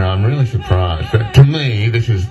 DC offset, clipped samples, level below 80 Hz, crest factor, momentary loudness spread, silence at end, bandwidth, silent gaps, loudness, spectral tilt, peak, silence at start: under 0.1%; 0.4%; -30 dBFS; 12 dB; 6 LU; 0 s; 12 kHz; none; -14 LUFS; -7.5 dB/octave; 0 dBFS; 0 s